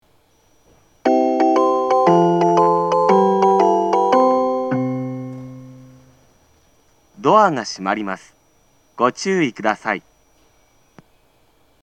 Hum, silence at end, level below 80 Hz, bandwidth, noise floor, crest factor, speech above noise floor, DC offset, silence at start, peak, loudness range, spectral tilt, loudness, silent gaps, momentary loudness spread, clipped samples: none; 1.85 s; -64 dBFS; 9.2 kHz; -58 dBFS; 18 dB; 38 dB; under 0.1%; 1.05 s; 0 dBFS; 9 LU; -6 dB/octave; -17 LUFS; none; 12 LU; under 0.1%